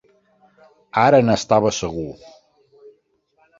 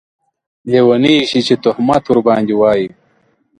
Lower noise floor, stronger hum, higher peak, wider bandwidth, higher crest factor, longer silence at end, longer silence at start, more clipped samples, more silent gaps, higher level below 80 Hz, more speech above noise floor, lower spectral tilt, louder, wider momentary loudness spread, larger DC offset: first, -63 dBFS vs -57 dBFS; neither; about the same, -2 dBFS vs 0 dBFS; second, 7.8 kHz vs 10.5 kHz; first, 20 dB vs 14 dB; first, 1.45 s vs 0.7 s; first, 0.95 s vs 0.65 s; neither; neither; about the same, -50 dBFS vs -52 dBFS; about the same, 46 dB vs 45 dB; about the same, -5 dB/octave vs -6 dB/octave; second, -18 LUFS vs -12 LUFS; first, 15 LU vs 7 LU; neither